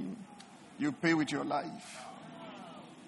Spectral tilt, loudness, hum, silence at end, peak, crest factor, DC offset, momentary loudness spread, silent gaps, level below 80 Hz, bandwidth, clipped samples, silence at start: -5 dB/octave; -34 LUFS; none; 0 s; -16 dBFS; 20 dB; under 0.1%; 20 LU; none; -78 dBFS; 11.5 kHz; under 0.1%; 0 s